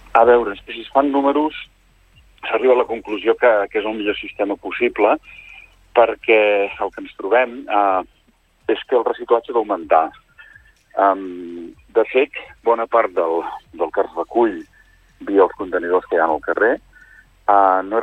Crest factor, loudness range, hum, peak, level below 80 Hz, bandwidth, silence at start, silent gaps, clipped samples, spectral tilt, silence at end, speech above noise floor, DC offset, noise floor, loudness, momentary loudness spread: 16 dB; 2 LU; none; -2 dBFS; -54 dBFS; 4.3 kHz; 0.15 s; none; under 0.1%; -6 dB/octave; 0 s; 40 dB; under 0.1%; -58 dBFS; -18 LUFS; 13 LU